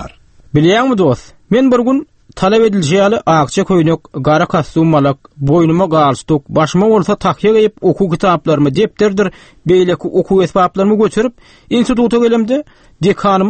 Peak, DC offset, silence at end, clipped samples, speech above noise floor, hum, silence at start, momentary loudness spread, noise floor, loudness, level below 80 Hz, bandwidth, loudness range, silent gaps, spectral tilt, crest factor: 0 dBFS; under 0.1%; 0 s; under 0.1%; 24 dB; none; 0 s; 6 LU; -36 dBFS; -12 LUFS; -40 dBFS; 8.8 kHz; 1 LU; none; -6.5 dB/octave; 12 dB